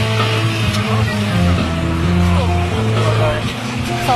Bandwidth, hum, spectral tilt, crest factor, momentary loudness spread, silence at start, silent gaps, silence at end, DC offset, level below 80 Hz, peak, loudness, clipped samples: 13.5 kHz; none; -6 dB/octave; 12 dB; 4 LU; 0 s; none; 0 s; under 0.1%; -30 dBFS; -4 dBFS; -16 LUFS; under 0.1%